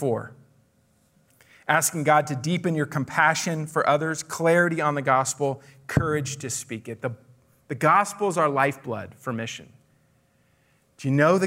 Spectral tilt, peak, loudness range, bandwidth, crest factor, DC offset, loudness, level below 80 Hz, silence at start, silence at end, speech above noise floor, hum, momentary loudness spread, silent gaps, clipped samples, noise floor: -4.5 dB/octave; -6 dBFS; 3 LU; 16 kHz; 20 dB; under 0.1%; -24 LUFS; -58 dBFS; 0 s; 0 s; 40 dB; none; 14 LU; none; under 0.1%; -64 dBFS